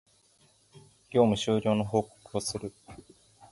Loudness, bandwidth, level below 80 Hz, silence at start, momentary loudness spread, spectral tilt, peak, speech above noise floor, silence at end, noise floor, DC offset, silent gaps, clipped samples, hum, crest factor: -29 LUFS; 11.5 kHz; -60 dBFS; 1.1 s; 12 LU; -5.5 dB/octave; -10 dBFS; 37 dB; 0.55 s; -64 dBFS; under 0.1%; none; under 0.1%; none; 22 dB